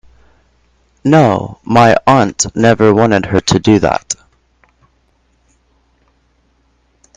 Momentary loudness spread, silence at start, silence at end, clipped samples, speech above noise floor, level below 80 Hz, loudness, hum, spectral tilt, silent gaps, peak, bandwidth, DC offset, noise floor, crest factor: 10 LU; 1.05 s; 3.05 s; 0.2%; 46 dB; -42 dBFS; -11 LUFS; none; -5 dB/octave; none; 0 dBFS; 10.5 kHz; under 0.1%; -57 dBFS; 14 dB